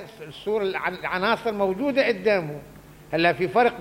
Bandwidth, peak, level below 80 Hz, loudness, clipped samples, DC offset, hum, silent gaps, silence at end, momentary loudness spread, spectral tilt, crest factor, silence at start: 16.5 kHz; -6 dBFS; -56 dBFS; -23 LUFS; under 0.1%; under 0.1%; none; none; 0 s; 12 LU; -6 dB/octave; 18 dB; 0 s